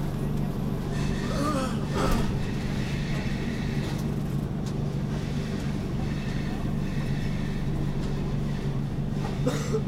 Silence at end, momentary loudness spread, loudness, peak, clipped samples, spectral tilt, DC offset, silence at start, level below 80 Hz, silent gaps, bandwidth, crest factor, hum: 0 s; 3 LU; -29 LUFS; -12 dBFS; under 0.1%; -7 dB/octave; under 0.1%; 0 s; -34 dBFS; none; 15.5 kHz; 16 dB; none